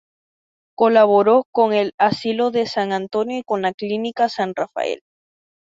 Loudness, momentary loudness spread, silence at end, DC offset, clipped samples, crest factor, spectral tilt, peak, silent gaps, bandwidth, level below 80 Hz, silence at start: -19 LUFS; 10 LU; 0.85 s; under 0.1%; under 0.1%; 18 dB; -6 dB/octave; -2 dBFS; 1.45-1.53 s, 1.94-1.98 s, 3.74-3.78 s; 7.8 kHz; -66 dBFS; 0.8 s